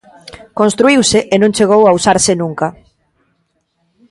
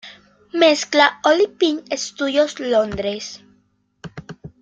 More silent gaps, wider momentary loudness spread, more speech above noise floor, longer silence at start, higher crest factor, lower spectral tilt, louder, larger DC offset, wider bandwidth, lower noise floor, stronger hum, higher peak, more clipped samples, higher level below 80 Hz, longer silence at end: neither; second, 11 LU vs 22 LU; first, 53 dB vs 44 dB; first, 0.55 s vs 0.05 s; about the same, 14 dB vs 18 dB; about the same, -4 dB/octave vs -3 dB/octave; first, -11 LUFS vs -18 LUFS; neither; first, 11.5 kHz vs 9 kHz; about the same, -64 dBFS vs -62 dBFS; neither; about the same, 0 dBFS vs -2 dBFS; neither; first, -44 dBFS vs -54 dBFS; first, 1.4 s vs 0.15 s